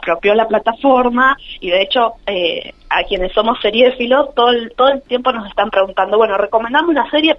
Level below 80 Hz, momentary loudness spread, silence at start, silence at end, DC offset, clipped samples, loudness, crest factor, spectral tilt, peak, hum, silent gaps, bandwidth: -40 dBFS; 5 LU; 0 s; 0 s; under 0.1%; under 0.1%; -14 LUFS; 14 dB; -6 dB/octave; 0 dBFS; none; none; 5.8 kHz